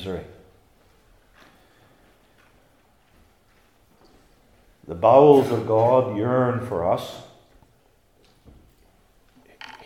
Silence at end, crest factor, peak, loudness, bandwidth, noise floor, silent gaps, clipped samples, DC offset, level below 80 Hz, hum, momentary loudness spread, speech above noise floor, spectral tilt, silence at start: 0.1 s; 24 dB; 0 dBFS; -19 LUFS; 15 kHz; -60 dBFS; none; under 0.1%; under 0.1%; -60 dBFS; none; 25 LU; 42 dB; -8 dB/octave; 0 s